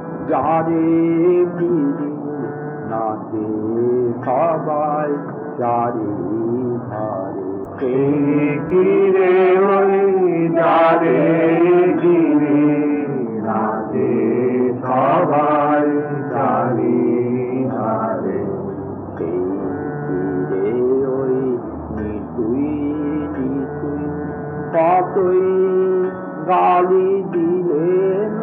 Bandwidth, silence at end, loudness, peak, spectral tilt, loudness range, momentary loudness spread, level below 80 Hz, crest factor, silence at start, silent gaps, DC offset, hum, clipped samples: 3.8 kHz; 0 s; -18 LUFS; -4 dBFS; -7.5 dB/octave; 7 LU; 11 LU; -50 dBFS; 12 dB; 0 s; none; under 0.1%; none; under 0.1%